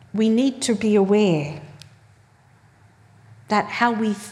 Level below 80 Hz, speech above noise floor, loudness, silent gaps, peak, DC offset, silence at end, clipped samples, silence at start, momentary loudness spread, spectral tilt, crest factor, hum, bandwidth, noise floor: -66 dBFS; 35 dB; -20 LUFS; none; -4 dBFS; under 0.1%; 0 s; under 0.1%; 0.15 s; 7 LU; -5.5 dB/octave; 18 dB; none; 12.5 kHz; -54 dBFS